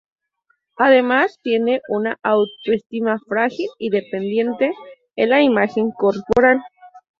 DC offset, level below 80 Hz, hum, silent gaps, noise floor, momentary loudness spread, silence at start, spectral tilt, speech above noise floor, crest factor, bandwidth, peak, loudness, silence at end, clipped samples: under 0.1%; -54 dBFS; none; 2.86-2.90 s; -67 dBFS; 8 LU; 0.8 s; -6.5 dB/octave; 49 dB; 16 dB; 7 kHz; -2 dBFS; -18 LUFS; 0.2 s; under 0.1%